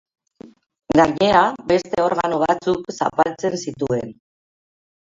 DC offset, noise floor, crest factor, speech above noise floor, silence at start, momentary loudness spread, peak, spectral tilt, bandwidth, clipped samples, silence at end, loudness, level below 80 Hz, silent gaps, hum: under 0.1%; -45 dBFS; 20 dB; 27 dB; 0.45 s; 9 LU; 0 dBFS; -5.5 dB/octave; 7.8 kHz; under 0.1%; 1 s; -19 LUFS; -52 dBFS; none; none